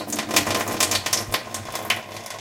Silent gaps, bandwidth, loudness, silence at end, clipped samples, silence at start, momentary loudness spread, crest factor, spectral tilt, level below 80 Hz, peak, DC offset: none; 17 kHz; -23 LUFS; 0 s; under 0.1%; 0 s; 10 LU; 24 dB; -1.5 dB/octave; -54 dBFS; 0 dBFS; under 0.1%